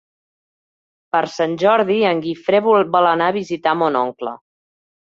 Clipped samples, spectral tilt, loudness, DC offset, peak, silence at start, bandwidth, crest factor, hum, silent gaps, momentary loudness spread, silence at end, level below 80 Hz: under 0.1%; -6 dB/octave; -17 LUFS; under 0.1%; -2 dBFS; 1.15 s; 7.6 kHz; 16 dB; none; none; 7 LU; 0.75 s; -64 dBFS